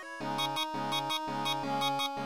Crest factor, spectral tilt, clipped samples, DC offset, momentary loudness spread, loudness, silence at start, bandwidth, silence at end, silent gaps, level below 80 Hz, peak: 16 dB; -3 dB/octave; under 0.1%; 0.2%; 2 LU; -32 LUFS; 0 s; over 20 kHz; 0 s; none; -74 dBFS; -18 dBFS